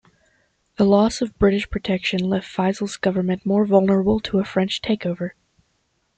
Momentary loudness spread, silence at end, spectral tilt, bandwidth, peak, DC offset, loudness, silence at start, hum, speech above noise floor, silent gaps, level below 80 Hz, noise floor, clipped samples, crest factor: 7 LU; 0.9 s; -6.5 dB/octave; 9 kHz; -4 dBFS; under 0.1%; -20 LUFS; 0.8 s; none; 49 dB; none; -44 dBFS; -68 dBFS; under 0.1%; 18 dB